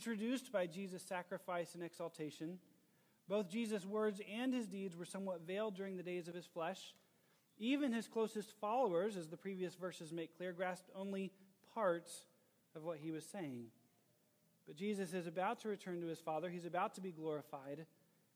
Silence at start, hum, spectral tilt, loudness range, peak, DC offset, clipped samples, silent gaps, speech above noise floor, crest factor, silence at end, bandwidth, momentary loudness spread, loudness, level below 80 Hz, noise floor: 0 s; none; -5.5 dB/octave; 5 LU; -26 dBFS; under 0.1%; under 0.1%; none; 33 dB; 20 dB; 0.5 s; over 20 kHz; 11 LU; -44 LUFS; under -90 dBFS; -77 dBFS